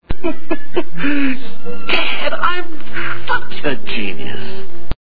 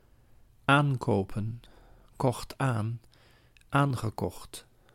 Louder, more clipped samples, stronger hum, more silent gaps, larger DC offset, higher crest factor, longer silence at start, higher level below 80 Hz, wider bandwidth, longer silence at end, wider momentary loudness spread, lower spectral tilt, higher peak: first, -21 LUFS vs -30 LUFS; neither; neither; neither; first, 50% vs under 0.1%; second, 16 dB vs 22 dB; second, 0 s vs 0.7 s; first, -34 dBFS vs -54 dBFS; second, 5.4 kHz vs 16 kHz; second, 0.05 s vs 0.35 s; second, 11 LU vs 19 LU; about the same, -7.5 dB/octave vs -6.5 dB/octave; first, 0 dBFS vs -8 dBFS